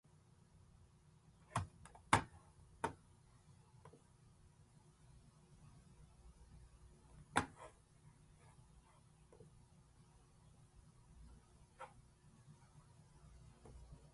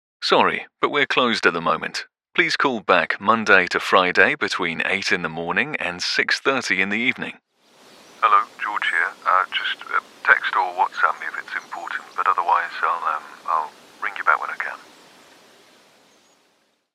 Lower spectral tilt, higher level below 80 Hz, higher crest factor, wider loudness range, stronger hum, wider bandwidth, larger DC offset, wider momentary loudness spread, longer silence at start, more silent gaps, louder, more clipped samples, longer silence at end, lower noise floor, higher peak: about the same, -4 dB/octave vs -3 dB/octave; about the same, -66 dBFS vs -70 dBFS; first, 38 dB vs 22 dB; first, 21 LU vs 6 LU; neither; second, 11.5 kHz vs 14.5 kHz; neither; first, 26 LU vs 12 LU; about the same, 0.1 s vs 0.2 s; neither; second, -43 LUFS vs -20 LUFS; neither; second, 0 s vs 2.1 s; first, -69 dBFS vs -65 dBFS; second, -14 dBFS vs 0 dBFS